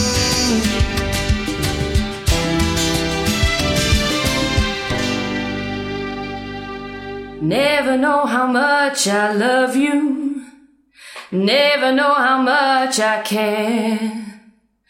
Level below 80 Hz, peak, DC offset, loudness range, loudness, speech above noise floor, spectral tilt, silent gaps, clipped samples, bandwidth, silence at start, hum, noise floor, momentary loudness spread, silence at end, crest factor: -30 dBFS; -2 dBFS; under 0.1%; 4 LU; -17 LUFS; 37 dB; -4 dB/octave; none; under 0.1%; 16.5 kHz; 0 s; none; -53 dBFS; 12 LU; 0.5 s; 14 dB